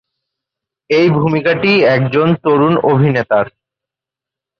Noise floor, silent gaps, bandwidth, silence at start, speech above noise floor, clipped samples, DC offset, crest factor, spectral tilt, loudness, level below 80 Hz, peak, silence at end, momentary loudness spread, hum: -86 dBFS; none; 6.6 kHz; 0.9 s; 74 dB; under 0.1%; under 0.1%; 12 dB; -8.5 dB/octave; -12 LUFS; -52 dBFS; -2 dBFS; 1.1 s; 5 LU; none